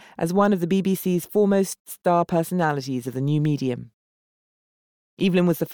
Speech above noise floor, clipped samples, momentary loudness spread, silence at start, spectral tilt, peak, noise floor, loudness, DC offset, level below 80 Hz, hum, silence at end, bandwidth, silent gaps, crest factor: over 68 dB; under 0.1%; 7 LU; 0.2 s; -6.5 dB/octave; -8 dBFS; under -90 dBFS; -23 LUFS; under 0.1%; -64 dBFS; none; 0 s; over 20 kHz; 1.80-1.85 s, 3.93-5.17 s; 16 dB